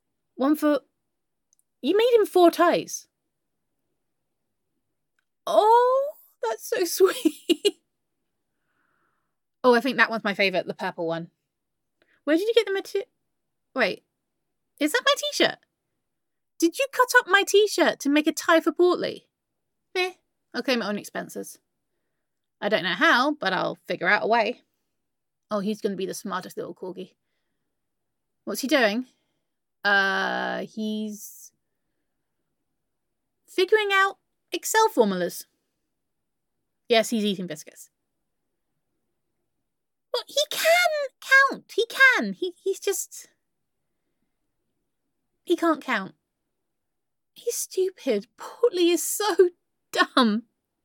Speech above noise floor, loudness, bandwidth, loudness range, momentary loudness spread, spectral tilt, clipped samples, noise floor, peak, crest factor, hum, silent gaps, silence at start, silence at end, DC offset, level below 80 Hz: 62 dB; -23 LUFS; 17.5 kHz; 9 LU; 16 LU; -3 dB/octave; under 0.1%; -85 dBFS; -4 dBFS; 22 dB; none; none; 0.4 s; 0.45 s; under 0.1%; -84 dBFS